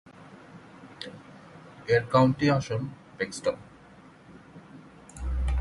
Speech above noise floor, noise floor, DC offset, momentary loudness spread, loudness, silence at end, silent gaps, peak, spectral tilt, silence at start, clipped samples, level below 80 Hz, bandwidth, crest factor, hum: 27 dB; -52 dBFS; under 0.1%; 27 LU; -27 LUFS; 0 s; none; -8 dBFS; -6.5 dB/octave; 0.2 s; under 0.1%; -38 dBFS; 11.5 kHz; 22 dB; none